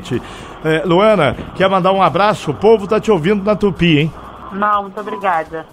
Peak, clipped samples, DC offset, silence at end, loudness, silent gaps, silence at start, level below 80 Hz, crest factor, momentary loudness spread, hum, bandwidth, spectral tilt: 0 dBFS; under 0.1%; under 0.1%; 0.1 s; -14 LUFS; none; 0 s; -40 dBFS; 14 dB; 11 LU; none; 13 kHz; -6.5 dB/octave